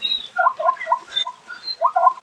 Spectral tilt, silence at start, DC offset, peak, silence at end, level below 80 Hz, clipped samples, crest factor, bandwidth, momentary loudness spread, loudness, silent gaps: 0 dB/octave; 0 s; under 0.1%; -2 dBFS; 0.05 s; -72 dBFS; under 0.1%; 20 dB; 9.4 kHz; 10 LU; -21 LUFS; none